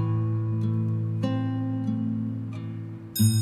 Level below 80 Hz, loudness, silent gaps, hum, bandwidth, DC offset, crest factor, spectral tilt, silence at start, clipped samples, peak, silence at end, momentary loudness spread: -60 dBFS; -28 LUFS; none; none; 15.5 kHz; under 0.1%; 16 dB; -6.5 dB/octave; 0 s; under 0.1%; -10 dBFS; 0 s; 9 LU